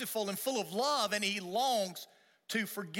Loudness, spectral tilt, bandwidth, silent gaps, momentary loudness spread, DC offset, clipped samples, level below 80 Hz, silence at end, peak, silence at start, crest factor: -33 LUFS; -2.5 dB/octave; 18 kHz; none; 8 LU; under 0.1%; under 0.1%; -84 dBFS; 0 s; -18 dBFS; 0 s; 18 dB